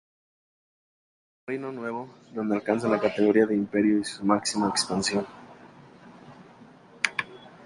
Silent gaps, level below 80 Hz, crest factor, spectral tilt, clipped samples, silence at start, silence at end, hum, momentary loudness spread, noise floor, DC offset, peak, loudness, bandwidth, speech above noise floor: none; -66 dBFS; 26 dB; -4 dB/octave; under 0.1%; 1.5 s; 0 s; none; 14 LU; -51 dBFS; under 0.1%; -2 dBFS; -26 LUFS; 11.5 kHz; 26 dB